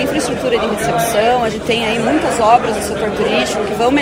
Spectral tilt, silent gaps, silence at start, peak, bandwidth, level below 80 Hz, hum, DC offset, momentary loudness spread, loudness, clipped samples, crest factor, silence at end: -4 dB/octave; none; 0 s; 0 dBFS; 16 kHz; -38 dBFS; none; under 0.1%; 5 LU; -15 LUFS; under 0.1%; 14 dB; 0 s